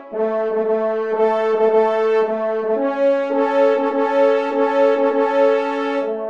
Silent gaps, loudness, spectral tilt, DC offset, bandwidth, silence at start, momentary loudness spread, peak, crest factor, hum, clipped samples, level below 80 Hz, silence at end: none; -18 LUFS; -6 dB/octave; 0.2%; 7.4 kHz; 0 s; 5 LU; -4 dBFS; 12 dB; none; under 0.1%; -70 dBFS; 0 s